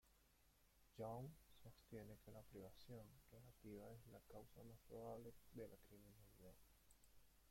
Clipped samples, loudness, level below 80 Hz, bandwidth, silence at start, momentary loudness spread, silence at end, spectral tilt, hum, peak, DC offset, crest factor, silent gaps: under 0.1%; -61 LUFS; -76 dBFS; 16.5 kHz; 0.05 s; 12 LU; 0 s; -6.5 dB/octave; none; -42 dBFS; under 0.1%; 20 dB; none